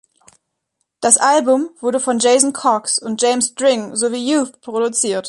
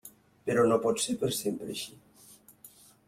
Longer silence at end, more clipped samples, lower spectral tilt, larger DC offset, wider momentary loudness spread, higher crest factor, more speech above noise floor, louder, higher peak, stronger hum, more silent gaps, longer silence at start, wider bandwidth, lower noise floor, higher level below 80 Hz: second, 0 s vs 0.4 s; neither; second, -2 dB/octave vs -4 dB/octave; neither; second, 7 LU vs 14 LU; about the same, 18 dB vs 20 dB; first, 57 dB vs 28 dB; first, -16 LUFS vs -29 LUFS; first, 0 dBFS vs -12 dBFS; neither; neither; first, 1 s vs 0.05 s; second, 11.5 kHz vs 16.5 kHz; first, -73 dBFS vs -57 dBFS; about the same, -66 dBFS vs -68 dBFS